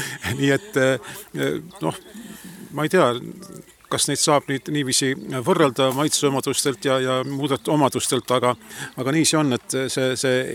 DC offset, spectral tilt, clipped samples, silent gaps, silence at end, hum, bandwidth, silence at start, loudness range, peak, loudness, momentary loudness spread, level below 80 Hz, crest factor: under 0.1%; -4 dB/octave; under 0.1%; none; 0 s; none; 18.5 kHz; 0 s; 4 LU; -4 dBFS; -21 LUFS; 15 LU; -60 dBFS; 18 dB